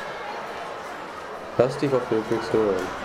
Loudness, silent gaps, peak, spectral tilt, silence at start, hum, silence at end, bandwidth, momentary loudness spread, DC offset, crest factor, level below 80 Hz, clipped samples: -26 LUFS; none; -6 dBFS; -6 dB/octave; 0 s; none; 0 s; 15 kHz; 12 LU; under 0.1%; 20 dB; -56 dBFS; under 0.1%